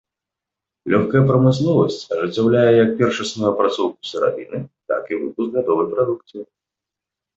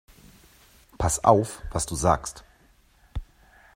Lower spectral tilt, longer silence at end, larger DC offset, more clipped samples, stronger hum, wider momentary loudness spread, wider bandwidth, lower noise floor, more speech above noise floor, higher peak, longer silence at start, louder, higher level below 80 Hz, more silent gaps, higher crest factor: first, -7 dB/octave vs -5 dB/octave; first, 0.95 s vs 0.5 s; neither; neither; neither; second, 14 LU vs 20 LU; second, 8 kHz vs 16 kHz; first, -86 dBFS vs -59 dBFS; first, 68 dB vs 36 dB; about the same, -4 dBFS vs -2 dBFS; second, 0.85 s vs 1 s; first, -18 LUFS vs -24 LUFS; second, -56 dBFS vs -42 dBFS; neither; second, 16 dB vs 26 dB